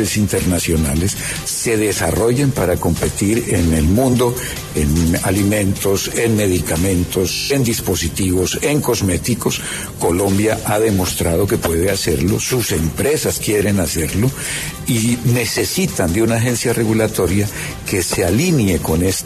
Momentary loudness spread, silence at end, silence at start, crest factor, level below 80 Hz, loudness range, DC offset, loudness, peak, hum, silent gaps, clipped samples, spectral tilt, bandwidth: 4 LU; 0 s; 0 s; 12 dB; -32 dBFS; 1 LU; under 0.1%; -17 LUFS; -4 dBFS; none; none; under 0.1%; -4.5 dB/octave; 14 kHz